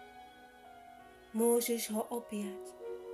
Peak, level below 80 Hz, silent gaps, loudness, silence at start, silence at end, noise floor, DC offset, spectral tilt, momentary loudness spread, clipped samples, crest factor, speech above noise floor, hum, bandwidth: -20 dBFS; -74 dBFS; none; -35 LUFS; 0 s; 0 s; -56 dBFS; under 0.1%; -3.5 dB/octave; 25 LU; under 0.1%; 18 dB; 22 dB; none; 15 kHz